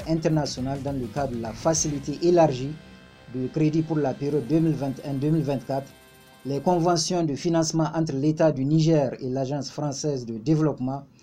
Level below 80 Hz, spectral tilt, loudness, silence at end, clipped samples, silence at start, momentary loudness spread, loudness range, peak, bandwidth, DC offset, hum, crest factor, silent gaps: -52 dBFS; -6 dB/octave; -25 LUFS; 0.15 s; under 0.1%; 0 s; 9 LU; 3 LU; -8 dBFS; 14.5 kHz; under 0.1%; none; 16 dB; none